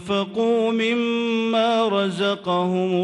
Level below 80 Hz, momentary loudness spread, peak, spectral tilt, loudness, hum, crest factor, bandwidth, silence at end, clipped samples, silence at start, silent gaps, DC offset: -66 dBFS; 3 LU; -10 dBFS; -6 dB/octave; -21 LUFS; none; 12 dB; 11 kHz; 0 s; under 0.1%; 0 s; none; under 0.1%